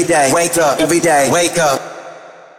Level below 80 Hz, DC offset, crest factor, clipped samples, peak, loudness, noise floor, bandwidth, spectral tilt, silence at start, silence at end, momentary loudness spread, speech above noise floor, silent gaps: -50 dBFS; under 0.1%; 10 dB; under 0.1%; -4 dBFS; -13 LUFS; -36 dBFS; 17 kHz; -3 dB/octave; 0 s; 0.25 s; 10 LU; 23 dB; none